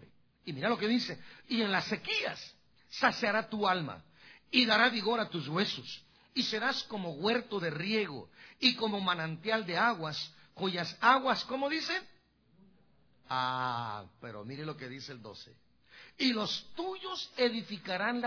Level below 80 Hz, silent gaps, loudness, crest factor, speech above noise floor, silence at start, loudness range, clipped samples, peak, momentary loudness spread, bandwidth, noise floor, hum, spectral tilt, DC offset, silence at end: -74 dBFS; none; -32 LUFS; 24 dB; 36 dB; 0 s; 7 LU; under 0.1%; -10 dBFS; 16 LU; 5.4 kHz; -69 dBFS; none; -4.5 dB/octave; under 0.1%; 0 s